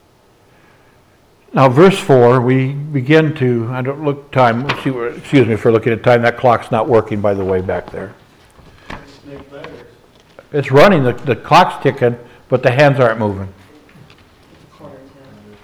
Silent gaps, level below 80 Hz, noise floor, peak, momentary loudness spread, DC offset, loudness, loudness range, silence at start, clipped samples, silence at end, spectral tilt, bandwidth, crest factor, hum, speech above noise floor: none; -48 dBFS; -50 dBFS; 0 dBFS; 21 LU; under 0.1%; -13 LUFS; 6 LU; 1.55 s; under 0.1%; 0.65 s; -7 dB/octave; 13.5 kHz; 14 dB; none; 38 dB